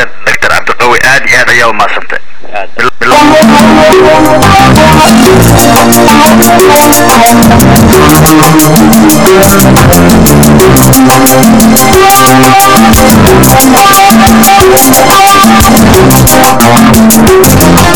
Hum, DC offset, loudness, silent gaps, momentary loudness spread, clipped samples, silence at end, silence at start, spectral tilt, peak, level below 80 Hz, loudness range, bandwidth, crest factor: none; 10%; -2 LUFS; none; 5 LU; 30%; 0 s; 0 s; -4.5 dB/octave; 0 dBFS; -20 dBFS; 3 LU; over 20 kHz; 4 dB